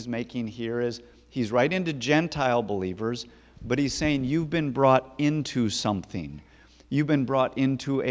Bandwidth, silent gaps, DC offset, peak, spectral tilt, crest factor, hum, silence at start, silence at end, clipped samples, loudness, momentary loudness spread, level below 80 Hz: 8 kHz; none; under 0.1%; -6 dBFS; -6 dB/octave; 20 dB; none; 0 s; 0 s; under 0.1%; -26 LUFS; 13 LU; -52 dBFS